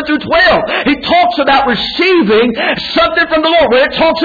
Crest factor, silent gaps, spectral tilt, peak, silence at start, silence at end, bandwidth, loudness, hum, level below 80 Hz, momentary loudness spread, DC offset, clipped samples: 10 dB; none; -6 dB/octave; 0 dBFS; 0 s; 0 s; 5 kHz; -10 LUFS; none; -38 dBFS; 4 LU; under 0.1%; under 0.1%